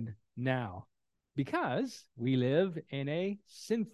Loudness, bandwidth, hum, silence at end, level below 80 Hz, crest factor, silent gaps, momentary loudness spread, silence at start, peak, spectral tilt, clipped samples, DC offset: -35 LUFS; 12.5 kHz; none; 0.05 s; -68 dBFS; 18 dB; none; 13 LU; 0 s; -16 dBFS; -7 dB/octave; under 0.1%; under 0.1%